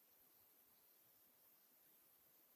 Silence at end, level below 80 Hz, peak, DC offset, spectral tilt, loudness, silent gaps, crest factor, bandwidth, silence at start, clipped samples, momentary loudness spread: 0 s; under -90 dBFS; -60 dBFS; under 0.1%; -1.5 dB/octave; -69 LUFS; none; 14 dB; 16 kHz; 0 s; under 0.1%; 0 LU